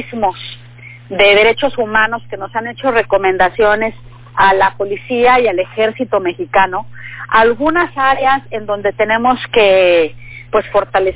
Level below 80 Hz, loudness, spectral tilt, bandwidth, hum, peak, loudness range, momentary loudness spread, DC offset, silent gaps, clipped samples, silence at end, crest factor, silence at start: -42 dBFS; -13 LUFS; -8 dB/octave; 4 kHz; 60 Hz at -40 dBFS; 0 dBFS; 1 LU; 12 LU; under 0.1%; none; under 0.1%; 0 s; 14 dB; 0 s